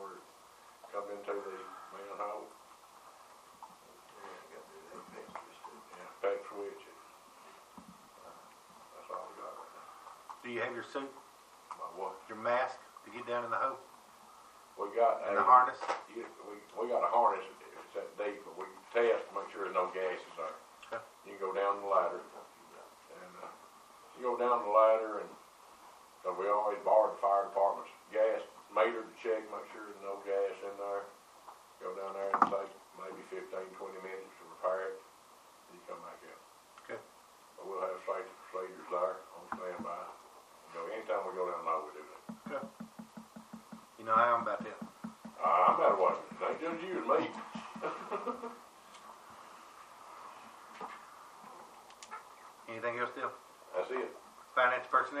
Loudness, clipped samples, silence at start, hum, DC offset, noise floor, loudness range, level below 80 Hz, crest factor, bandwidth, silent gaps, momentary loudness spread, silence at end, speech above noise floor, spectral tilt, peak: -35 LUFS; under 0.1%; 0 s; none; under 0.1%; -60 dBFS; 15 LU; -84 dBFS; 28 dB; 15 kHz; none; 25 LU; 0 s; 26 dB; -4.5 dB/octave; -10 dBFS